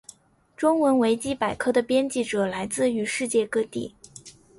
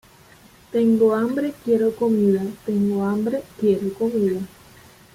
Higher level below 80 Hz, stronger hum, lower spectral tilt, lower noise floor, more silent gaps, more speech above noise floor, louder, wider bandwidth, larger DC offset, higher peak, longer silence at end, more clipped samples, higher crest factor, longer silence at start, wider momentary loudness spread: about the same, -60 dBFS vs -60 dBFS; neither; second, -4 dB/octave vs -8 dB/octave; first, -54 dBFS vs -50 dBFS; neither; about the same, 30 dB vs 30 dB; second, -24 LUFS vs -21 LUFS; second, 11.5 kHz vs 16 kHz; neither; about the same, -8 dBFS vs -8 dBFS; second, 0.3 s vs 0.7 s; neither; about the same, 16 dB vs 14 dB; second, 0.6 s vs 0.75 s; first, 14 LU vs 7 LU